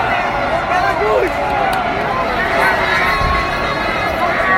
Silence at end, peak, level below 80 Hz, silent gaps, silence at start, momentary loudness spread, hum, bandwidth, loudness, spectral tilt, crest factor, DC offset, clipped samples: 0 s; -2 dBFS; -32 dBFS; none; 0 s; 4 LU; none; 16.5 kHz; -15 LUFS; -5 dB/octave; 14 dB; under 0.1%; under 0.1%